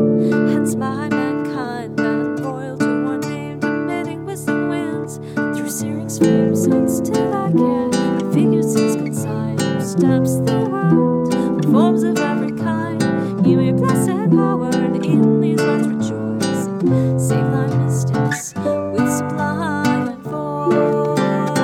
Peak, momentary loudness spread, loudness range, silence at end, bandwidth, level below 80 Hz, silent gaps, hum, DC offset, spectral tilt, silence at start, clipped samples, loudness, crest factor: -2 dBFS; 7 LU; 5 LU; 0 s; 16.5 kHz; -54 dBFS; none; none; under 0.1%; -6.5 dB/octave; 0 s; under 0.1%; -18 LUFS; 14 dB